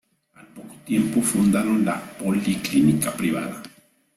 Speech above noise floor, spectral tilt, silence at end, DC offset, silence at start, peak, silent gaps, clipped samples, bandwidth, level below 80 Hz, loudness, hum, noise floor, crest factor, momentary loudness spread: 31 dB; -5 dB/octave; 0.5 s; under 0.1%; 0.55 s; -6 dBFS; none; under 0.1%; 15.5 kHz; -56 dBFS; -22 LUFS; none; -52 dBFS; 16 dB; 13 LU